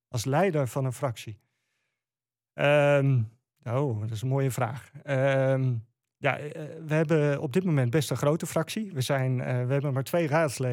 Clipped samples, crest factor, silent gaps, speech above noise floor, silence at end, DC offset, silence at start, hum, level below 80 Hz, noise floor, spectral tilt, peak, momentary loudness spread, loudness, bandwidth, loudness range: under 0.1%; 16 dB; none; over 64 dB; 0 s; under 0.1%; 0.1 s; none; -70 dBFS; under -90 dBFS; -6.5 dB/octave; -10 dBFS; 10 LU; -27 LUFS; 16.5 kHz; 2 LU